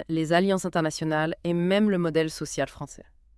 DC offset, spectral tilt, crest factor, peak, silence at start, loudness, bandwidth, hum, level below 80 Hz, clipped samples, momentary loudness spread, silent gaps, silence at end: under 0.1%; -5.5 dB/octave; 20 dB; -6 dBFS; 0 s; -25 LUFS; 12 kHz; none; -56 dBFS; under 0.1%; 8 LU; none; 0.4 s